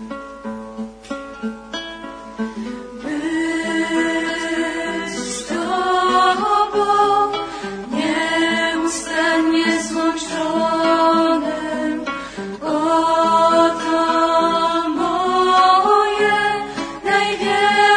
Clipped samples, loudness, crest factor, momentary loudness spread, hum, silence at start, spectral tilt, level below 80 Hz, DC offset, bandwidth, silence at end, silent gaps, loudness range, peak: under 0.1%; -18 LUFS; 16 dB; 15 LU; none; 0 s; -3 dB/octave; -50 dBFS; under 0.1%; 10.5 kHz; 0 s; none; 7 LU; -2 dBFS